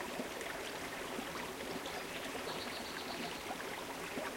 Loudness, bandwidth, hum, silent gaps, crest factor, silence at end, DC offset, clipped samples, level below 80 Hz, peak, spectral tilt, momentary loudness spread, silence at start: -42 LUFS; 16.5 kHz; none; none; 16 dB; 0 s; under 0.1%; under 0.1%; -66 dBFS; -28 dBFS; -2.5 dB/octave; 1 LU; 0 s